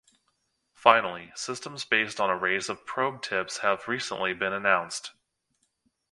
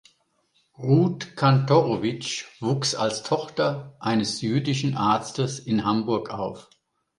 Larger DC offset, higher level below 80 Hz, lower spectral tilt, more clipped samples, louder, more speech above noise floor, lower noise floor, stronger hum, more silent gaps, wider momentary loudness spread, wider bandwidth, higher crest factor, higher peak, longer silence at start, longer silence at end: neither; second, -70 dBFS vs -60 dBFS; second, -2.5 dB/octave vs -5.5 dB/octave; neither; second, -27 LUFS vs -24 LUFS; first, 48 dB vs 44 dB; first, -75 dBFS vs -68 dBFS; neither; neither; first, 13 LU vs 10 LU; about the same, 11.5 kHz vs 11 kHz; first, 28 dB vs 18 dB; first, -2 dBFS vs -6 dBFS; about the same, 0.8 s vs 0.8 s; first, 1 s vs 0.6 s